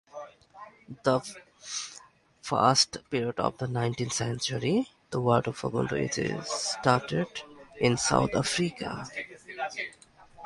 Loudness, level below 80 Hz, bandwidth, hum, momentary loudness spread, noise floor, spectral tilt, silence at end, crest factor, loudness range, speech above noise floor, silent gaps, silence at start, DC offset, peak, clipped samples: -29 LUFS; -58 dBFS; 11.5 kHz; none; 18 LU; -54 dBFS; -4 dB/octave; 0 s; 24 dB; 2 LU; 26 dB; none; 0.15 s; under 0.1%; -6 dBFS; under 0.1%